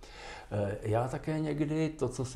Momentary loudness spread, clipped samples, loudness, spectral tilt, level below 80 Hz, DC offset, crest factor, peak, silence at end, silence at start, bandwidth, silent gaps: 7 LU; under 0.1%; -33 LUFS; -7 dB/octave; -52 dBFS; under 0.1%; 14 dB; -18 dBFS; 0 s; 0 s; 12.5 kHz; none